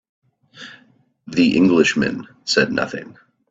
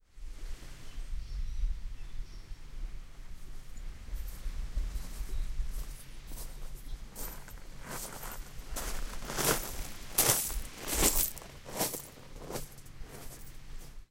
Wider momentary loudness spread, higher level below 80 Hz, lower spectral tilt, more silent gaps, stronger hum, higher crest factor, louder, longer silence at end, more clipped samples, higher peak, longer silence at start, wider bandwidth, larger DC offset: about the same, 24 LU vs 22 LU; second, -56 dBFS vs -40 dBFS; first, -4.5 dB/octave vs -2 dB/octave; neither; neither; second, 20 dB vs 28 dB; first, -18 LUFS vs -35 LUFS; first, 0.4 s vs 0.05 s; neither; first, 0 dBFS vs -8 dBFS; first, 0.55 s vs 0.15 s; second, 8 kHz vs 16.5 kHz; neither